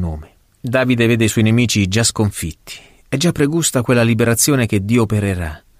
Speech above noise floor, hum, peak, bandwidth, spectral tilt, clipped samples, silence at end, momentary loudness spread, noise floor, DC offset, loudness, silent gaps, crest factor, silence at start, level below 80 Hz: 20 dB; none; -2 dBFS; 16 kHz; -4.5 dB/octave; under 0.1%; 0.2 s; 13 LU; -35 dBFS; under 0.1%; -15 LUFS; none; 14 dB; 0 s; -38 dBFS